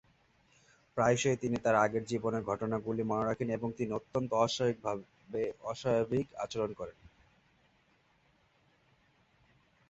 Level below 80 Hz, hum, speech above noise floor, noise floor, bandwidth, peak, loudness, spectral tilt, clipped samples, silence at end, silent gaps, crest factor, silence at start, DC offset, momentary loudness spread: -64 dBFS; none; 37 dB; -70 dBFS; 8.2 kHz; -14 dBFS; -33 LUFS; -5.5 dB/octave; under 0.1%; 3 s; none; 22 dB; 0.95 s; under 0.1%; 10 LU